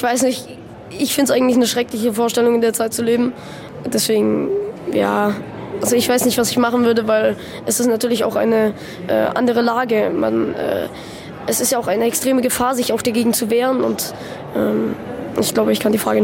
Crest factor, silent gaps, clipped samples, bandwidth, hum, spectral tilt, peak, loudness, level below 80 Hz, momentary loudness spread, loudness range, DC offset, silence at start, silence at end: 14 dB; none; under 0.1%; 17 kHz; none; -4 dB/octave; -4 dBFS; -17 LUFS; -52 dBFS; 11 LU; 2 LU; under 0.1%; 0 s; 0 s